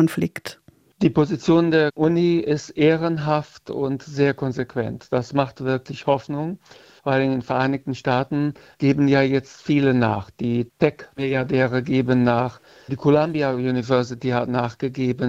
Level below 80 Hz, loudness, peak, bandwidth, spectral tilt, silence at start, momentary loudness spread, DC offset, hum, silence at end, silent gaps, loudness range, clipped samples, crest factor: -56 dBFS; -21 LUFS; -2 dBFS; 15 kHz; -7.5 dB/octave; 0 s; 9 LU; under 0.1%; none; 0 s; none; 4 LU; under 0.1%; 18 dB